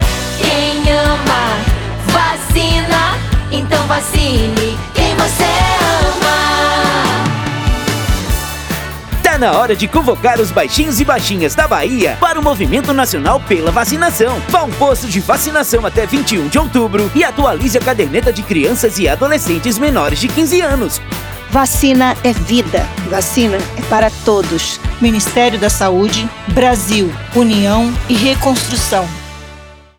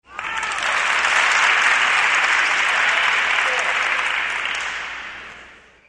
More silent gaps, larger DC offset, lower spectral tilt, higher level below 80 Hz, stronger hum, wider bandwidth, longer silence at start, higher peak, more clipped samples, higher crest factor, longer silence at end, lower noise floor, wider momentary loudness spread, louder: neither; neither; first, -4 dB/octave vs 1 dB/octave; first, -24 dBFS vs -56 dBFS; neither; first, over 20 kHz vs 11.5 kHz; about the same, 0 s vs 0.1 s; first, 0 dBFS vs -4 dBFS; neither; about the same, 12 dB vs 16 dB; about the same, 0.25 s vs 0.35 s; second, -35 dBFS vs -45 dBFS; second, 5 LU vs 13 LU; first, -13 LUFS vs -17 LUFS